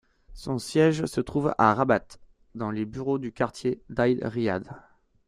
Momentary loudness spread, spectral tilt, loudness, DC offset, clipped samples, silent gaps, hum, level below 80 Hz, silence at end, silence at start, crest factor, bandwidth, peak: 11 LU; -6.5 dB/octave; -26 LUFS; under 0.1%; under 0.1%; none; none; -54 dBFS; 0.45 s; 0.3 s; 22 dB; 14.5 kHz; -6 dBFS